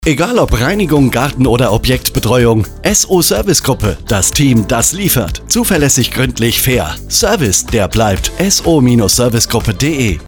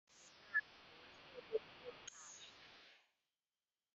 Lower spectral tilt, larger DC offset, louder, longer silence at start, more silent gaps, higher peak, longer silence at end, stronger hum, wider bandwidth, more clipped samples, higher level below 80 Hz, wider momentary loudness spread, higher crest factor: first, -4 dB/octave vs 0.5 dB/octave; neither; first, -11 LUFS vs -47 LUFS; about the same, 0 s vs 0.1 s; neither; first, 0 dBFS vs -28 dBFS; second, 0 s vs 0.9 s; neither; first, over 20 kHz vs 8 kHz; neither; first, -26 dBFS vs -86 dBFS; second, 4 LU vs 20 LU; second, 12 dB vs 24 dB